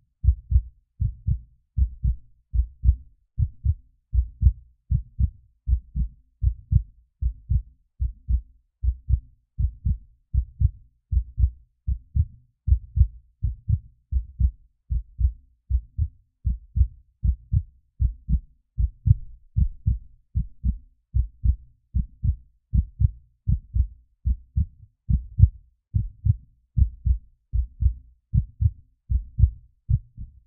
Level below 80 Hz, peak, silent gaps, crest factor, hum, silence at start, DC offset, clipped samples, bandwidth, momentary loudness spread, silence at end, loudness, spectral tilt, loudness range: -26 dBFS; 0 dBFS; none; 24 dB; none; 0.25 s; under 0.1%; under 0.1%; 0.4 kHz; 9 LU; 0.2 s; -28 LUFS; -28.5 dB/octave; 3 LU